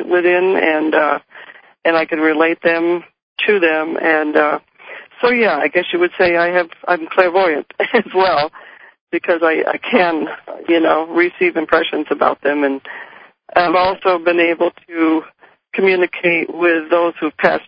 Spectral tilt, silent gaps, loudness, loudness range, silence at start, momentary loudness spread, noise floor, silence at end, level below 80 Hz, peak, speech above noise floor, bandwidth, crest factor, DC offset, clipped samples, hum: -7.5 dB/octave; 3.23-3.36 s, 9.01-9.07 s; -15 LUFS; 1 LU; 0 s; 8 LU; -40 dBFS; 0.05 s; -58 dBFS; 0 dBFS; 25 dB; 5.2 kHz; 16 dB; under 0.1%; under 0.1%; none